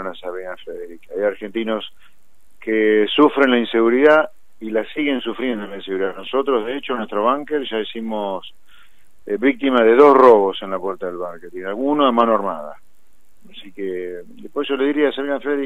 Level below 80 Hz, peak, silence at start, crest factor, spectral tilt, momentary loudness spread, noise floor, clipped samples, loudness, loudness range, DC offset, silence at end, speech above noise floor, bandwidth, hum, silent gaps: -62 dBFS; 0 dBFS; 0 s; 18 dB; -6 dB/octave; 18 LU; -61 dBFS; under 0.1%; -18 LUFS; 7 LU; 1%; 0 s; 43 dB; 5.2 kHz; none; none